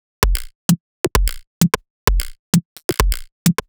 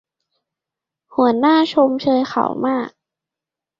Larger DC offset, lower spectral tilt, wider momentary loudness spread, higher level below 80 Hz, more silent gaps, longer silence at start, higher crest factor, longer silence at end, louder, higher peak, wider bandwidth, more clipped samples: neither; second, -4.5 dB/octave vs -6 dB/octave; second, 4 LU vs 10 LU; first, -24 dBFS vs -64 dBFS; first, 0.55-0.69 s, 0.80-1.04 s, 1.47-1.61 s, 1.90-2.07 s, 2.39-2.53 s, 2.65-2.76 s, 2.84-2.89 s, 3.32-3.46 s vs none; second, 0.2 s vs 1.15 s; about the same, 20 dB vs 18 dB; second, 0.15 s vs 0.9 s; second, -20 LUFS vs -17 LUFS; about the same, 0 dBFS vs -2 dBFS; first, over 20 kHz vs 7.4 kHz; neither